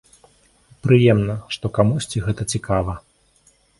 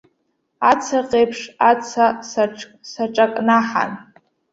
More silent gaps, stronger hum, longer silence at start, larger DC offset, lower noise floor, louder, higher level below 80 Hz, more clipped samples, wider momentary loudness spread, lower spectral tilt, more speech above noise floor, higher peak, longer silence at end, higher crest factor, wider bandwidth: neither; neither; first, 0.85 s vs 0.6 s; neither; second, -58 dBFS vs -69 dBFS; about the same, -20 LUFS vs -18 LUFS; first, -42 dBFS vs -62 dBFS; neither; first, 13 LU vs 10 LU; first, -6.5 dB/octave vs -4 dB/octave; second, 39 dB vs 51 dB; about the same, 0 dBFS vs -2 dBFS; first, 0.8 s vs 0.5 s; about the same, 20 dB vs 18 dB; first, 11.5 kHz vs 8 kHz